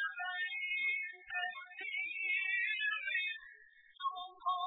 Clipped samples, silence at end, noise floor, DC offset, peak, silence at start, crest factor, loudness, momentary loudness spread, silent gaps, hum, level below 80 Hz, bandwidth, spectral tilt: under 0.1%; 0 s; -61 dBFS; under 0.1%; -24 dBFS; 0 s; 14 dB; -36 LUFS; 9 LU; none; none; -86 dBFS; 4.1 kHz; -1 dB/octave